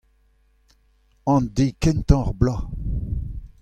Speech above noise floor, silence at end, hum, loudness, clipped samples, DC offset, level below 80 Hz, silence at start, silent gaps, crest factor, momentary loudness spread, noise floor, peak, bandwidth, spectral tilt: 41 dB; 0.15 s; none; -23 LUFS; under 0.1%; under 0.1%; -30 dBFS; 1.25 s; none; 22 dB; 11 LU; -60 dBFS; -2 dBFS; 10 kHz; -7.5 dB/octave